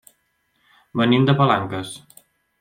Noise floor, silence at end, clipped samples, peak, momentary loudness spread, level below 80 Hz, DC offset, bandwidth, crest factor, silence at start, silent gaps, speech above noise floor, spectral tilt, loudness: -68 dBFS; 0.65 s; under 0.1%; -4 dBFS; 17 LU; -58 dBFS; under 0.1%; 15.5 kHz; 18 dB; 0.95 s; none; 49 dB; -6.5 dB/octave; -19 LUFS